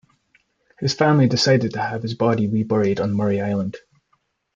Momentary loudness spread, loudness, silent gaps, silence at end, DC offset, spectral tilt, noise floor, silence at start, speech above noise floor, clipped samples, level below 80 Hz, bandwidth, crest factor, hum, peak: 9 LU; -20 LUFS; none; 0.8 s; under 0.1%; -6 dB/octave; -68 dBFS; 0.8 s; 48 dB; under 0.1%; -60 dBFS; 7.6 kHz; 18 dB; none; -4 dBFS